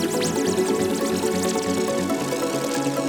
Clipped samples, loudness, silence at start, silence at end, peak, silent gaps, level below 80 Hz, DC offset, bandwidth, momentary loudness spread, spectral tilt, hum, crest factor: under 0.1%; -23 LUFS; 0 s; 0 s; -10 dBFS; none; -56 dBFS; under 0.1%; over 20 kHz; 2 LU; -4 dB/octave; none; 14 dB